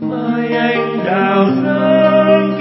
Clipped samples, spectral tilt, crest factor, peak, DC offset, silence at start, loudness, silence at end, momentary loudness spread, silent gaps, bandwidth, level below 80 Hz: under 0.1%; -11.5 dB/octave; 12 dB; 0 dBFS; under 0.1%; 0 s; -13 LUFS; 0 s; 6 LU; none; 5.8 kHz; -62 dBFS